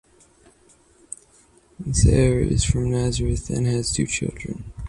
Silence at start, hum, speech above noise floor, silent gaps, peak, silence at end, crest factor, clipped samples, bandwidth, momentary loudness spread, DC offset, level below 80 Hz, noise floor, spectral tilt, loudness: 1.8 s; none; 35 dB; none; -4 dBFS; 0 s; 18 dB; under 0.1%; 11 kHz; 20 LU; under 0.1%; -30 dBFS; -56 dBFS; -5.5 dB/octave; -22 LUFS